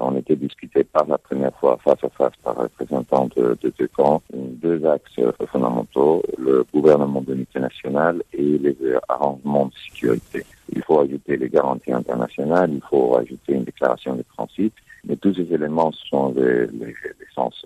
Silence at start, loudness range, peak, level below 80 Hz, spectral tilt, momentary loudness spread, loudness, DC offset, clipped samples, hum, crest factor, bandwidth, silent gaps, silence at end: 0 s; 3 LU; -2 dBFS; -58 dBFS; -8 dB/octave; 8 LU; -21 LUFS; under 0.1%; under 0.1%; none; 18 dB; 13 kHz; none; 0.05 s